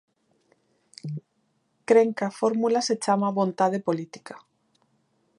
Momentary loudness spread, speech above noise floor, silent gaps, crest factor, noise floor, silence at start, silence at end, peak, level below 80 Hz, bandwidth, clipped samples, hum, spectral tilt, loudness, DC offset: 21 LU; 47 dB; none; 20 dB; -71 dBFS; 1.05 s; 1 s; -6 dBFS; -80 dBFS; 11 kHz; under 0.1%; none; -5.5 dB/octave; -24 LUFS; under 0.1%